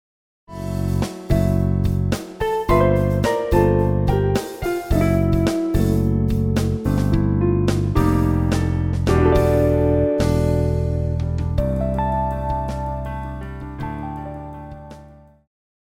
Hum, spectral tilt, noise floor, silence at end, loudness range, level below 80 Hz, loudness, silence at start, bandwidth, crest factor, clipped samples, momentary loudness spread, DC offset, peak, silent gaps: none; -8 dB/octave; -45 dBFS; 0.85 s; 7 LU; -28 dBFS; -20 LUFS; 0.5 s; 16.5 kHz; 16 dB; under 0.1%; 13 LU; under 0.1%; -4 dBFS; none